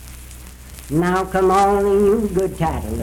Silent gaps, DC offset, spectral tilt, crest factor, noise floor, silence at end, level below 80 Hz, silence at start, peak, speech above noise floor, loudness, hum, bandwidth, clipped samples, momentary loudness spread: none; under 0.1%; -6.5 dB/octave; 12 dB; -37 dBFS; 0 s; -34 dBFS; 0 s; -6 dBFS; 20 dB; -18 LUFS; none; 18.5 kHz; under 0.1%; 22 LU